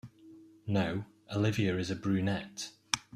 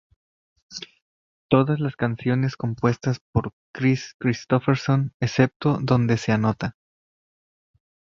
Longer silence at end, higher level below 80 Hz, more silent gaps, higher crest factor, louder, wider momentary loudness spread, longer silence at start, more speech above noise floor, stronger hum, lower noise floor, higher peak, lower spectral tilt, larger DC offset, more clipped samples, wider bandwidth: second, 0.15 s vs 1.4 s; second, -64 dBFS vs -52 dBFS; second, none vs 1.02-1.49 s, 3.21-3.33 s, 3.53-3.74 s, 4.14-4.20 s, 5.14-5.20 s, 5.56-5.60 s; about the same, 26 dB vs 22 dB; second, -33 LUFS vs -23 LUFS; about the same, 12 LU vs 12 LU; second, 0.05 s vs 0.7 s; second, 24 dB vs over 68 dB; neither; second, -56 dBFS vs under -90 dBFS; second, -8 dBFS vs -2 dBFS; second, -5 dB/octave vs -7 dB/octave; neither; neither; first, 14 kHz vs 7.4 kHz